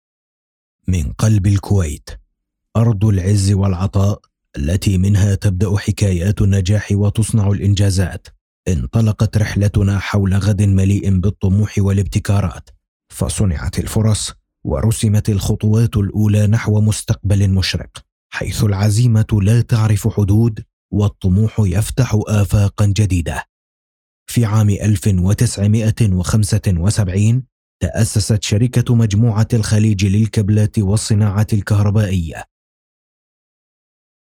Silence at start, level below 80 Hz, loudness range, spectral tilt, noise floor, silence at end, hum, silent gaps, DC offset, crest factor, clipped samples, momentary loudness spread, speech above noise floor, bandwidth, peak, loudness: 0.9 s; -32 dBFS; 3 LU; -6.5 dB/octave; -70 dBFS; 1.85 s; none; 8.41-8.63 s, 12.88-13.00 s, 18.12-18.30 s, 20.73-20.89 s, 23.49-24.26 s, 27.52-27.80 s; under 0.1%; 14 dB; under 0.1%; 7 LU; 56 dB; 15 kHz; -2 dBFS; -16 LUFS